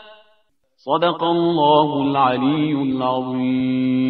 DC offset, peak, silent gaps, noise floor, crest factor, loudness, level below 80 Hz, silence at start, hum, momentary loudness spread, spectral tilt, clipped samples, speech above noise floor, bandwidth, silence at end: under 0.1%; -2 dBFS; none; -61 dBFS; 16 dB; -18 LUFS; -62 dBFS; 0.05 s; none; 6 LU; -9.5 dB/octave; under 0.1%; 43 dB; 4.7 kHz; 0 s